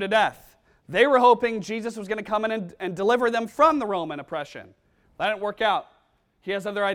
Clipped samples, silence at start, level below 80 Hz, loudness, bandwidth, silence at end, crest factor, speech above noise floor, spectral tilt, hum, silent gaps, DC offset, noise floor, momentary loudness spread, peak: under 0.1%; 0 s; -62 dBFS; -24 LUFS; 15 kHz; 0 s; 20 dB; 42 dB; -4.5 dB/octave; none; none; under 0.1%; -65 dBFS; 14 LU; -6 dBFS